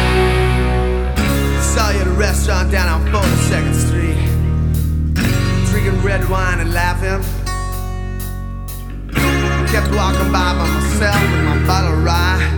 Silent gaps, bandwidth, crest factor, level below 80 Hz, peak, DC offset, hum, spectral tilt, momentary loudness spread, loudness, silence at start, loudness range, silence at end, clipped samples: none; over 20 kHz; 14 dB; -18 dBFS; 0 dBFS; under 0.1%; none; -5.5 dB/octave; 8 LU; -16 LUFS; 0 s; 4 LU; 0 s; under 0.1%